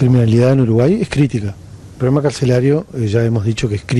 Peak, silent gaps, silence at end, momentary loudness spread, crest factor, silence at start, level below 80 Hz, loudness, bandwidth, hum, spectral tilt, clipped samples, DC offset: -2 dBFS; none; 0 s; 8 LU; 12 dB; 0 s; -40 dBFS; -15 LUFS; 11.5 kHz; none; -7.5 dB/octave; under 0.1%; under 0.1%